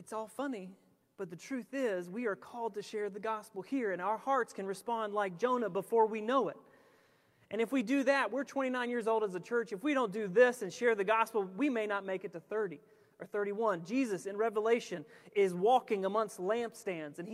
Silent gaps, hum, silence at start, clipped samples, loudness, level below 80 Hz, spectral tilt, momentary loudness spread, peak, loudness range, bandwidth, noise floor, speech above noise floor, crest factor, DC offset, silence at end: none; none; 0 s; under 0.1%; -34 LUFS; -88 dBFS; -5 dB/octave; 11 LU; -14 dBFS; 5 LU; 15 kHz; -68 dBFS; 35 dB; 20 dB; under 0.1%; 0 s